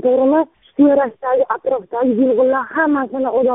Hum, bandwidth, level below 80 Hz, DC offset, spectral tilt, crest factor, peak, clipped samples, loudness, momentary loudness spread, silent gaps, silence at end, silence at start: none; 3.9 kHz; -58 dBFS; under 0.1%; 0 dB/octave; 14 dB; -2 dBFS; under 0.1%; -16 LUFS; 5 LU; none; 0 s; 0.05 s